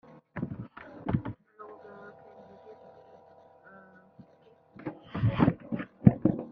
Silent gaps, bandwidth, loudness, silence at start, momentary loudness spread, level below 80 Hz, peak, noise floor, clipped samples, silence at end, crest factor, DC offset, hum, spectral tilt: none; 5 kHz; -30 LUFS; 0.35 s; 27 LU; -54 dBFS; -2 dBFS; -61 dBFS; under 0.1%; 0 s; 30 dB; under 0.1%; none; -11.5 dB/octave